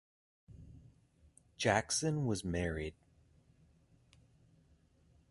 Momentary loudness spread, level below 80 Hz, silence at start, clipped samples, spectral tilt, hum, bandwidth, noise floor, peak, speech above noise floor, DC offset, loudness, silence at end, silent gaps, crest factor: 25 LU; -56 dBFS; 0.5 s; under 0.1%; -4 dB/octave; none; 11.5 kHz; -69 dBFS; -16 dBFS; 34 dB; under 0.1%; -35 LUFS; 2.4 s; none; 26 dB